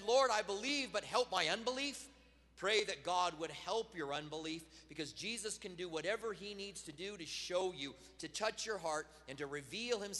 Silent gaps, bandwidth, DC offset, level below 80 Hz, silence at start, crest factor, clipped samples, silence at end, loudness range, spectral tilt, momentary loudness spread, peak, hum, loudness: none; 12 kHz; under 0.1%; -70 dBFS; 0 s; 22 dB; under 0.1%; 0 s; 6 LU; -2 dB/octave; 12 LU; -18 dBFS; none; -40 LUFS